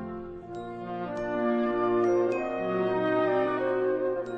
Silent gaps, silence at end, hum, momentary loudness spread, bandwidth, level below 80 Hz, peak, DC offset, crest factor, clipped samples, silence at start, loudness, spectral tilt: none; 0 s; none; 13 LU; 7.2 kHz; -58 dBFS; -14 dBFS; under 0.1%; 12 dB; under 0.1%; 0 s; -28 LUFS; -7.5 dB/octave